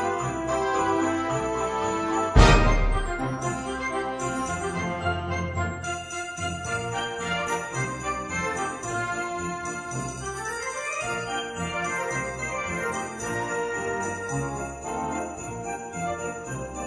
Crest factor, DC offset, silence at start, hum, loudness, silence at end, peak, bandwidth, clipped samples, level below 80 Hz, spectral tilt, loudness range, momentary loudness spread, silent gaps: 24 dB; under 0.1%; 0 s; none; -27 LUFS; 0 s; -2 dBFS; 11 kHz; under 0.1%; -34 dBFS; -4.5 dB/octave; 6 LU; 8 LU; none